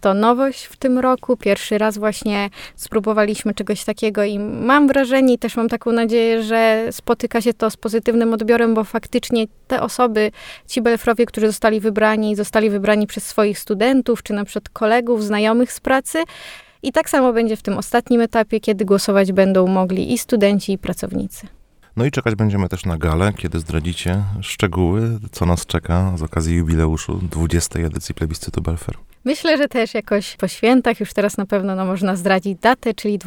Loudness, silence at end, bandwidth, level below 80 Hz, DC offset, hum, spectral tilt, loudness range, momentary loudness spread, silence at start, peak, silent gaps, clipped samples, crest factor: -18 LUFS; 0 s; 19 kHz; -36 dBFS; under 0.1%; none; -5.5 dB/octave; 4 LU; 8 LU; 0 s; 0 dBFS; none; under 0.1%; 16 dB